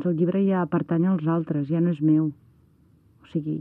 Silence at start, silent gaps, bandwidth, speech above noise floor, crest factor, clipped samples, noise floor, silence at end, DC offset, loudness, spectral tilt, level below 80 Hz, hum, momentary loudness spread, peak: 0 s; none; 3.6 kHz; 35 dB; 12 dB; under 0.1%; -58 dBFS; 0 s; under 0.1%; -24 LUFS; -11.5 dB/octave; -66 dBFS; none; 8 LU; -12 dBFS